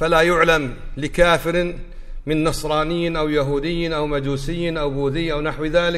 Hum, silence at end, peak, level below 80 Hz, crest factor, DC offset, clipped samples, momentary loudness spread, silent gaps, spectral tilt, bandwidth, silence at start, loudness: none; 0 s; -2 dBFS; -32 dBFS; 18 dB; under 0.1%; under 0.1%; 10 LU; none; -5.5 dB/octave; 15 kHz; 0 s; -20 LUFS